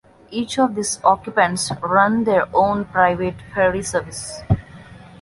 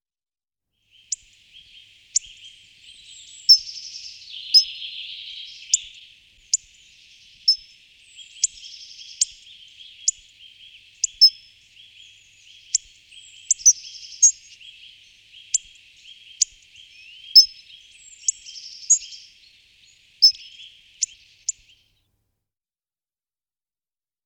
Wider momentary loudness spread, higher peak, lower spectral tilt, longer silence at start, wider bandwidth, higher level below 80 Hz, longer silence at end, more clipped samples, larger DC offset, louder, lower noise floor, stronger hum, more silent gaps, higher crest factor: second, 8 LU vs 24 LU; about the same, -2 dBFS vs -2 dBFS; first, -4.5 dB/octave vs 6.5 dB/octave; second, 0.3 s vs 2.15 s; second, 11.5 kHz vs 19.5 kHz; first, -42 dBFS vs -68 dBFS; second, 0.15 s vs 2.75 s; neither; neither; about the same, -19 LUFS vs -19 LUFS; second, -41 dBFS vs under -90 dBFS; neither; neither; second, 18 dB vs 24 dB